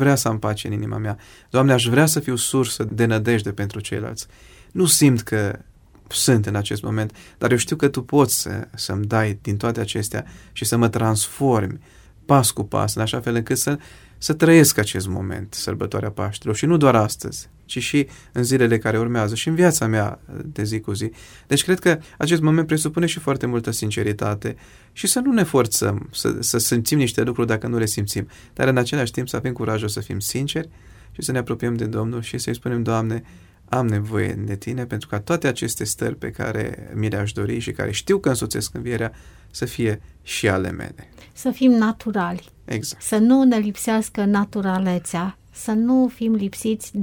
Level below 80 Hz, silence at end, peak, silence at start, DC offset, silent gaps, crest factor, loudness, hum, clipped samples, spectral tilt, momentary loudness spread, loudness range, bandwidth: -48 dBFS; 0 s; -2 dBFS; 0 s; under 0.1%; none; 20 dB; -21 LUFS; none; under 0.1%; -5 dB/octave; 12 LU; 5 LU; 19 kHz